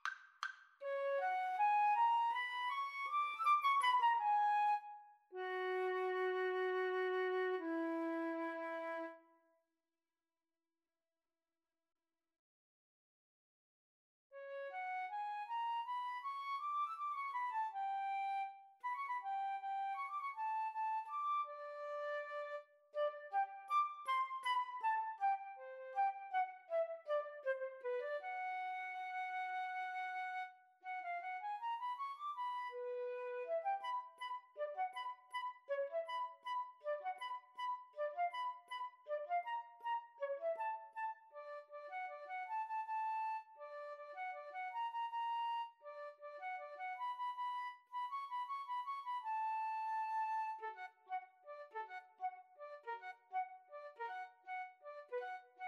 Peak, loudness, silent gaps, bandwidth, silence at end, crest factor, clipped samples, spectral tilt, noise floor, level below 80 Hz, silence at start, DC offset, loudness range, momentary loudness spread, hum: -24 dBFS; -42 LUFS; 12.39-14.30 s; 13 kHz; 0 s; 18 dB; under 0.1%; -1 dB/octave; under -90 dBFS; under -90 dBFS; 0.05 s; under 0.1%; 10 LU; 11 LU; none